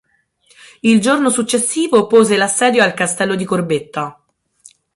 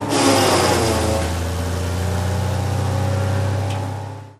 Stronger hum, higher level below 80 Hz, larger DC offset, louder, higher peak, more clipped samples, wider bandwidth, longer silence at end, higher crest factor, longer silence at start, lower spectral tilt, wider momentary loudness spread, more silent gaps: neither; second, -58 dBFS vs -34 dBFS; neither; first, -14 LUFS vs -19 LUFS; about the same, 0 dBFS vs -2 dBFS; neither; second, 11.5 kHz vs 15.5 kHz; first, 0.85 s vs 0.05 s; about the same, 14 dB vs 16 dB; first, 0.85 s vs 0 s; second, -3.5 dB/octave vs -5 dB/octave; about the same, 8 LU vs 9 LU; neither